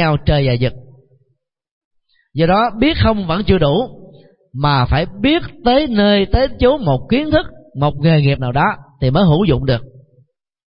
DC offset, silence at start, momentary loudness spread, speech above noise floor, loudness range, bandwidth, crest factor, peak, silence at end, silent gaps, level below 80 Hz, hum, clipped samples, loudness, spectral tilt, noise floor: under 0.1%; 0 s; 7 LU; 53 dB; 3 LU; 5.4 kHz; 14 dB; 0 dBFS; 0.8 s; 1.71-1.91 s; -30 dBFS; none; under 0.1%; -15 LUFS; -12.5 dB/octave; -67 dBFS